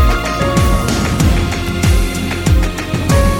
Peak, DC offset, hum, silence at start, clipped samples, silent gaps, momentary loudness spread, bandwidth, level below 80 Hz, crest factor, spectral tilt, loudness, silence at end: 0 dBFS; under 0.1%; none; 0 s; under 0.1%; none; 4 LU; 19.5 kHz; -16 dBFS; 12 dB; -5.5 dB/octave; -15 LUFS; 0 s